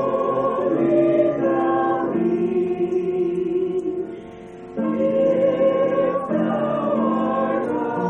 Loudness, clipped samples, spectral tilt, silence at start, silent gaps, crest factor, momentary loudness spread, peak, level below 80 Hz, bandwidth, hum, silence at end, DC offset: -21 LUFS; under 0.1%; -9 dB/octave; 0 s; none; 14 dB; 8 LU; -6 dBFS; -58 dBFS; 6.2 kHz; none; 0 s; under 0.1%